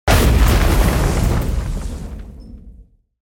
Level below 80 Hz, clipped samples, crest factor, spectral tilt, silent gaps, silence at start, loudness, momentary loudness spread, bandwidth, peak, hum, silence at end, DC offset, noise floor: -18 dBFS; under 0.1%; 14 dB; -5.5 dB/octave; none; 0.05 s; -17 LUFS; 20 LU; 17 kHz; -2 dBFS; none; 0.4 s; under 0.1%; -45 dBFS